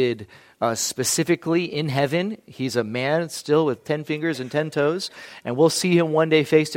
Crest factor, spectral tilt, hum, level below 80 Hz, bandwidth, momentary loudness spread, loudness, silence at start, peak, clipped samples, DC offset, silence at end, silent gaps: 18 dB; -4.5 dB/octave; none; -66 dBFS; 16.5 kHz; 10 LU; -22 LUFS; 0 s; -4 dBFS; under 0.1%; under 0.1%; 0 s; none